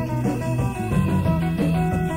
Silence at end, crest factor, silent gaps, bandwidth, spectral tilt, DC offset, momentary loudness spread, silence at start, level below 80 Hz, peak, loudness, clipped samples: 0 s; 12 dB; none; 16 kHz; -8 dB/octave; under 0.1%; 3 LU; 0 s; -36 dBFS; -10 dBFS; -22 LUFS; under 0.1%